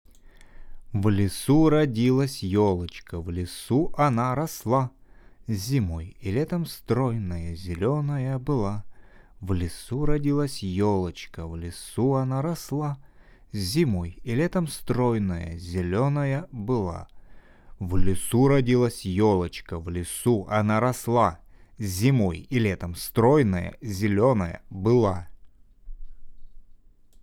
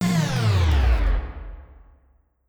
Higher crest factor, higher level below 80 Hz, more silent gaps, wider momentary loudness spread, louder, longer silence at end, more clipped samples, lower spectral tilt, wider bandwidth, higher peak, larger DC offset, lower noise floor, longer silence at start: first, 18 dB vs 12 dB; second, -42 dBFS vs -24 dBFS; neither; second, 12 LU vs 19 LU; second, -25 LUFS vs -22 LUFS; second, 0.6 s vs 0.85 s; neither; about the same, -7 dB/octave vs -6 dB/octave; about the same, 17.5 kHz vs 18.5 kHz; about the same, -8 dBFS vs -10 dBFS; neither; second, -51 dBFS vs -60 dBFS; first, 0.25 s vs 0 s